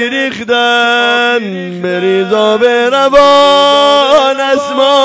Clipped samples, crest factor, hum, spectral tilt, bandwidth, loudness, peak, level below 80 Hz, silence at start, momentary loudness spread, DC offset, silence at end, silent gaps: 3%; 8 dB; none; -3.5 dB/octave; 8 kHz; -9 LUFS; 0 dBFS; -46 dBFS; 0 s; 9 LU; under 0.1%; 0 s; none